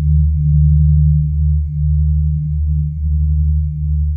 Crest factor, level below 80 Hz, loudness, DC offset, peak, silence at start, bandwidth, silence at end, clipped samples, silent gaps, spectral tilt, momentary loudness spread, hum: 10 dB; -16 dBFS; -15 LUFS; under 0.1%; -4 dBFS; 0 s; 0.3 kHz; 0 s; under 0.1%; none; -14.5 dB/octave; 6 LU; none